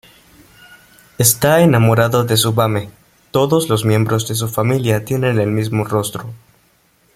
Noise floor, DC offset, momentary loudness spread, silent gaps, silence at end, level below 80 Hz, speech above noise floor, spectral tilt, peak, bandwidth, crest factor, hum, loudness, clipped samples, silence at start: -56 dBFS; under 0.1%; 10 LU; none; 0.8 s; -48 dBFS; 41 dB; -5 dB/octave; 0 dBFS; 16.5 kHz; 16 dB; none; -15 LUFS; under 0.1%; 1.2 s